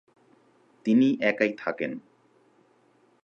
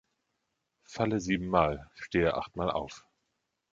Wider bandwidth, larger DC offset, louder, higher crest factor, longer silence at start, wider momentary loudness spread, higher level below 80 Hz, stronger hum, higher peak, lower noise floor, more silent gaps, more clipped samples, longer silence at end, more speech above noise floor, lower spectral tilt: second, 7 kHz vs 7.8 kHz; neither; first, -25 LUFS vs -31 LUFS; about the same, 20 dB vs 24 dB; about the same, 0.85 s vs 0.9 s; second, 12 LU vs 15 LU; second, -80 dBFS vs -52 dBFS; neither; about the same, -10 dBFS vs -8 dBFS; second, -63 dBFS vs -82 dBFS; neither; neither; first, 1.25 s vs 0.75 s; second, 39 dB vs 51 dB; about the same, -7 dB/octave vs -6 dB/octave